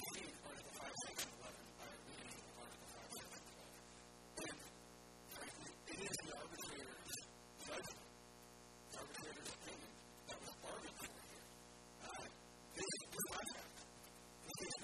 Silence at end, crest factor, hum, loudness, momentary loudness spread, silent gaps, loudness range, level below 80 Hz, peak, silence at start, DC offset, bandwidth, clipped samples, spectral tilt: 0 s; 22 dB; 60 Hz at -70 dBFS; -52 LUFS; 13 LU; none; 4 LU; -74 dBFS; -32 dBFS; 0 s; under 0.1%; 14 kHz; under 0.1%; -2 dB/octave